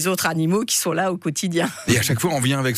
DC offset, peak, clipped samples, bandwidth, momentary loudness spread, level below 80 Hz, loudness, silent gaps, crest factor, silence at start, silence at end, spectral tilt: under 0.1%; -6 dBFS; under 0.1%; 15.5 kHz; 4 LU; -56 dBFS; -20 LUFS; none; 16 dB; 0 s; 0 s; -4 dB/octave